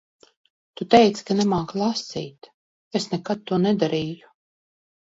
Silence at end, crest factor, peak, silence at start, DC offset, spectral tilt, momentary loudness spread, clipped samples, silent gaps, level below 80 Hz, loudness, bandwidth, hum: 0.9 s; 24 dB; 0 dBFS; 0.8 s; under 0.1%; -5.5 dB/octave; 17 LU; under 0.1%; 2.54-2.91 s; -60 dBFS; -22 LUFS; 8 kHz; none